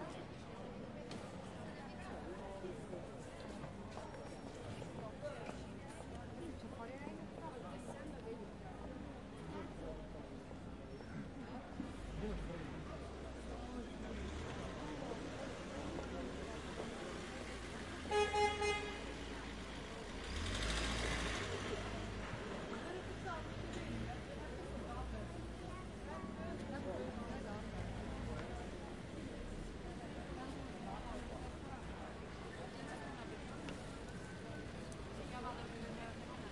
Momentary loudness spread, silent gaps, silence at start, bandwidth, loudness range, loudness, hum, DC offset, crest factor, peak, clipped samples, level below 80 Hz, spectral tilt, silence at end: 9 LU; none; 0 s; 11.5 kHz; 8 LU; -47 LUFS; none; under 0.1%; 22 dB; -24 dBFS; under 0.1%; -54 dBFS; -5 dB/octave; 0 s